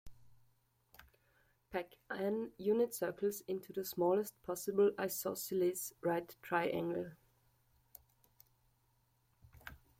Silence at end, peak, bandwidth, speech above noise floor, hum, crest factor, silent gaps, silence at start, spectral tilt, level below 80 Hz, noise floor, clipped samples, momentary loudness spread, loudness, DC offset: 0.25 s; -20 dBFS; 16.5 kHz; 39 dB; none; 20 dB; none; 0.05 s; -5 dB/octave; -72 dBFS; -76 dBFS; under 0.1%; 11 LU; -38 LUFS; under 0.1%